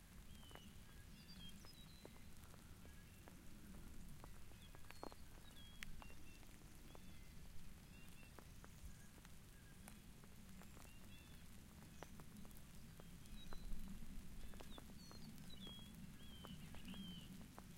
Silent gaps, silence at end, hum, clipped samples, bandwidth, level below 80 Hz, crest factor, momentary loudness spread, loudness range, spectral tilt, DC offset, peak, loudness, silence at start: none; 0 s; none; under 0.1%; 16 kHz; -60 dBFS; 26 dB; 6 LU; 4 LU; -4.5 dB/octave; under 0.1%; -30 dBFS; -60 LUFS; 0 s